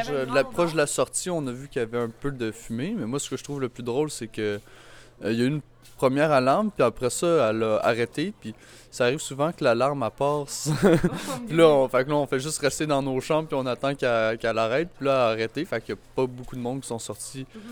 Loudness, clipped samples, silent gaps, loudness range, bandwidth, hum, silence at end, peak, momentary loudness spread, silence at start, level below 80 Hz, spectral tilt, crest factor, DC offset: -25 LUFS; under 0.1%; none; 7 LU; 19 kHz; none; 0 s; -4 dBFS; 11 LU; 0 s; -52 dBFS; -5 dB/octave; 20 dB; under 0.1%